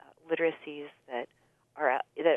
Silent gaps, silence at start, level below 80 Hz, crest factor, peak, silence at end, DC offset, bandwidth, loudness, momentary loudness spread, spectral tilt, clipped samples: none; 0.25 s; -88 dBFS; 20 dB; -12 dBFS; 0 s; under 0.1%; 3.8 kHz; -32 LUFS; 14 LU; -6.5 dB/octave; under 0.1%